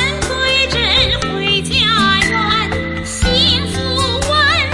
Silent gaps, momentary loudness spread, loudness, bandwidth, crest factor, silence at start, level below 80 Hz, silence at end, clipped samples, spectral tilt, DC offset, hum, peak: none; 6 LU; -13 LUFS; 11.5 kHz; 14 dB; 0 s; -28 dBFS; 0 s; under 0.1%; -3.5 dB/octave; under 0.1%; none; -2 dBFS